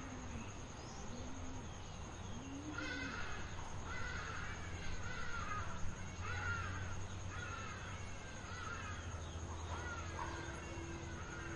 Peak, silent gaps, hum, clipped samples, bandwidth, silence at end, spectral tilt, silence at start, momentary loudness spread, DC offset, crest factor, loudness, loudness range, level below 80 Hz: -28 dBFS; none; none; under 0.1%; 11 kHz; 0 s; -4.5 dB/octave; 0 s; 6 LU; under 0.1%; 16 dB; -46 LUFS; 2 LU; -54 dBFS